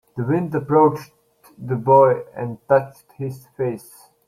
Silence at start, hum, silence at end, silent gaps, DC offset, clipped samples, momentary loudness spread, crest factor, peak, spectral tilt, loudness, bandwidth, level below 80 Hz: 0.15 s; none; 0.5 s; none; under 0.1%; under 0.1%; 19 LU; 18 dB; -2 dBFS; -9 dB/octave; -19 LUFS; 14.5 kHz; -60 dBFS